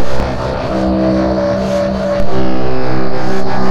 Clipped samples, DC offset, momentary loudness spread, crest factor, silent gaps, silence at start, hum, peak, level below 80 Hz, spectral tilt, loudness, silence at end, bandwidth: under 0.1%; under 0.1%; 5 LU; 8 dB; none; 0 s; none; 0 dBFS; -28 dBFS; -7 dB/octave; -16 LUFS; 0 s; 12 kHz